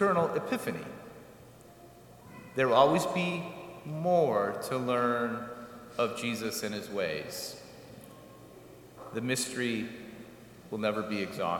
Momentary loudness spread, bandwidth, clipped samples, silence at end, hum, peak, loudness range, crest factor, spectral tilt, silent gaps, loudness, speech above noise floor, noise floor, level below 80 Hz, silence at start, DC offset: 24 LU; 18 kHz; under 0.1%; 0 s; none; -10 dBFS; 8 LU; 24 dB; -4.5 dB/octave; none; -31 LUFS; 23 dB; -53 dBFS; -68 dBFS; 0 s; under 0.1%